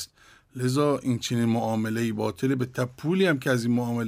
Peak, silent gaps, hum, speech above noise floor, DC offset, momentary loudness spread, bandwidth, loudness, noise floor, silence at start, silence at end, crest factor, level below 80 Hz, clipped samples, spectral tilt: -10 dBFS; none; none; 29 dB; under 0.1%; 7 LU; 16 kHz; -26 LUFS; -54 dBFS; 0 s; 0 s; 14 dB; -64 dBFS; under 0.1%; -6 dB/octave